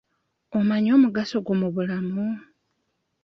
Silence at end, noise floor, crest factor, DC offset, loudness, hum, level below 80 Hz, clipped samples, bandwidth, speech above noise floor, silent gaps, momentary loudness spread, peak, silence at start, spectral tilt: 0.85 s; -75 dBFS; 16 dB; under 0.1%; -23 LUFS; none; -66 dBFS; under 0.1%; 6.6 kHz; 53 dB; none; 11 LU; -8 dBFS; 0.5 s; -8 dB/octave